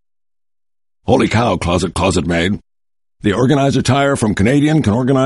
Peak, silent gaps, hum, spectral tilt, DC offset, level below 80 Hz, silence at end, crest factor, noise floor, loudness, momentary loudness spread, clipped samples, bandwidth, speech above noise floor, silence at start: 0 dBFS; none; none; -6 dB/octave; 0.1%; -38 dBFS; 0 s; 14 dB; under -90 dBFS; -15 LUFS; 6 LU; under 0.1%; 11.5 kHz; over 77 dB; 1.05 s